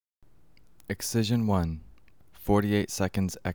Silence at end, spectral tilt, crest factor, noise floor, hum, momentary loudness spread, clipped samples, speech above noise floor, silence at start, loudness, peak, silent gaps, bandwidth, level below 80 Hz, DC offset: 0 s; -5.5 dB/octave; 18 dB; -62 dBFS; none; 13 LU; under 0.1%; 35 dB; 0.9 s; -28 LUFS; -10 dBFS; none; over 20 kHz; -48 dBFS; 0.2%